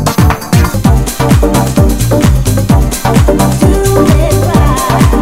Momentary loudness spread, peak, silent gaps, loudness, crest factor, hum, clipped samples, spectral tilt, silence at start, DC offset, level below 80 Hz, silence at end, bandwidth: 2 LU; 0 dBFS; none; -9 LUFS; 8 dB; none; 3%; -6 dB/octave; 0 s; under 0.1%; -14 dBFS; 0 s; 16.5 kHz